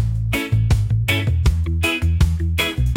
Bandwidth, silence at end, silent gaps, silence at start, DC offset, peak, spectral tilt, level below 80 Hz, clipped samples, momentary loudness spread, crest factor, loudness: 17 kHz; 0 s; none; 0 s; under 0.1%; -4 dBFS; -5.5 dB/octave; -24 dBFS; under 0.1%; 2 LU; 14 dB; -19 LUFS